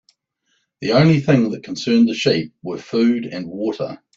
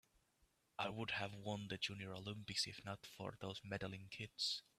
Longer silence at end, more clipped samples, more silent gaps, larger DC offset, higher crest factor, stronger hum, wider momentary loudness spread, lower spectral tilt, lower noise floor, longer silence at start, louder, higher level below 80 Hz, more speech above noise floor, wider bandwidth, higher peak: about the same, 0.2 s vs 0.2 s; neither; neither; neither; about the same, 18 dB vs 20 dB; neither; first, 14 LU vs 9 LU; first, -6.5 dB/octave vs -3.5 dB/octave; second, -68 dBFS vs -80 dBFS; about the same, 0.8 s vs 0.8 s; first, -18 LUFS vs -46 LUFS; first, -56 dBFS vs -76 dBFS; first, 51 dB vs 32 dB; second, 7.6 kHz vs 15 kHz; first, -2 dBFS vs -28 dBFS